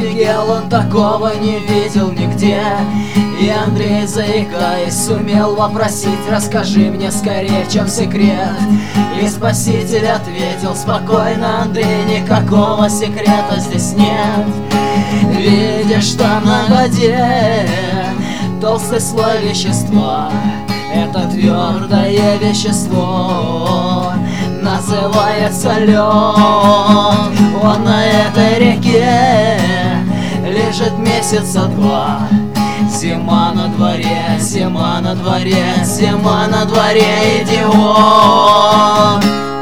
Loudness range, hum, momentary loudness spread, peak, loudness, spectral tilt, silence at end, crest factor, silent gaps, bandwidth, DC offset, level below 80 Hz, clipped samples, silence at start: 5 LU; none; 7 LU; 0 dBFS; -12 LUFS; -5.5 dB/octave; 0 s; 12 dB; none; 16 kHz; 3%; -42 dBFS; 0.1%; 0 s